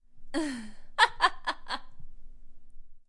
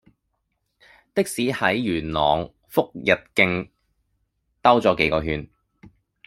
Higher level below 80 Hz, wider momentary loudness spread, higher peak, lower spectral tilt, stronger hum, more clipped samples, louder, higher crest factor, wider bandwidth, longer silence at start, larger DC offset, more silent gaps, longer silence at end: about the same, -48 dBFS vs -48 dBFS; first, 15 LU vs 11 LU; second, -6 dBFS vs -2 dBFS; second, -2 dB/octave vs -5 dB/octave; neither; neither; second, -29 LUFS vs -22 LUFS; about the same, 26 dB vs 22 dB; second, 11.5 kHz vs 16 kHz; second, 0.1 s vs 1.15 s; neither; neither; second, 0.05 s vs 0.4 s